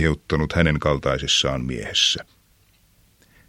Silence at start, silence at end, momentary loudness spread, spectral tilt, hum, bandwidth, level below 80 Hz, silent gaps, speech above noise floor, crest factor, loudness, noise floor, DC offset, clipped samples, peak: 0 s; 1.25 s; 5 LU; -4 dB/octave; none; 13.5 kHz; -36 dBFS; none; 37 dB; 22 dB; -21 LUFS; -59 dBFS; under 0.1%; under 0.1%; -2 dBFS